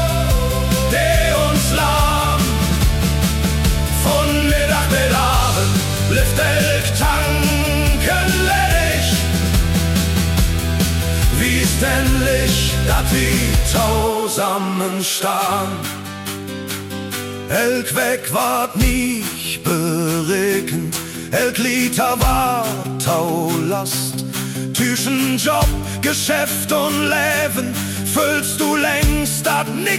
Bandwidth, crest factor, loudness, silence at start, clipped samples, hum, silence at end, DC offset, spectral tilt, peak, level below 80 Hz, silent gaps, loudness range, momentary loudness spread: 17.5 kHz; 14 dB; -17 LUFS; 0 s; under 0.1%; none; 0 s; under 0.1%; -4 dB/octave; -2 dBFS; -24 dBFS; none; 4 LU; 6 LU